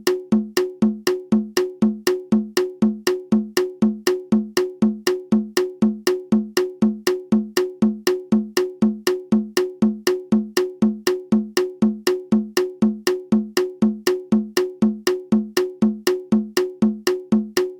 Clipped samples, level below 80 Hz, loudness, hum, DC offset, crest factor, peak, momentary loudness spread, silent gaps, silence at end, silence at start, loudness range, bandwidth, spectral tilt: under 0.1%; -54 dBFS; -21 LUFS; none; under 0.1%; 18 dB; -4 dBFS; 4 LU; none; 0 s; 0.05 s; 0 LU; 17.5 kHz; -5 dB/octave